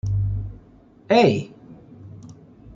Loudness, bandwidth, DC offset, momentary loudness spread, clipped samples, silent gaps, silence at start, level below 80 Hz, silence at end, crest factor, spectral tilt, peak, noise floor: -21 LUFS; 7.6 kHz; under 0.1%; 26 LU; under 0.1%; none; 0.05 s; -40 dBFS; 0.05 s; 20 dB; -7 dB/octave; -4 dBFS; -50 dBFS